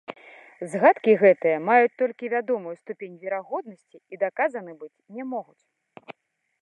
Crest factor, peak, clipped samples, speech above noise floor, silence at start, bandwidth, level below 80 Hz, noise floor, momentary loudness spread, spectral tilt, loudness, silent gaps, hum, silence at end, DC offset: 20 dB; -4 dBFS; under 0.1%; 49 dB; 0.1 s; 11 kHz; -84 dBFS; -73 dBFS; 21 LU; -7 dB/octave; -23 LUFS; none; none; 0.5 s; under 0.1%